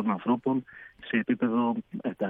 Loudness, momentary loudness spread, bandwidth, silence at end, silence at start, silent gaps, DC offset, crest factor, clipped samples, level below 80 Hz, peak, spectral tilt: -28 LUFS; 11 LU; 3.9 kHz; 0 s; 0 s; none; under 0.1%; 18 dB; under 0.1%; -70 dBFS; -12 dBFS; -9.5 dB/octave